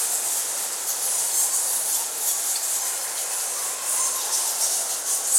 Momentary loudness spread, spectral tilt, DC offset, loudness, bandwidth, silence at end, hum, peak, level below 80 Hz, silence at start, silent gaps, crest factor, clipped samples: 5 LU; 3 dB/octave; under 0.1%; -22 LUFS; 16.5 kHz; 0 s; none; -4 dBFS; -82 dBFS; 0 s; none; 20 dB; under 0.1%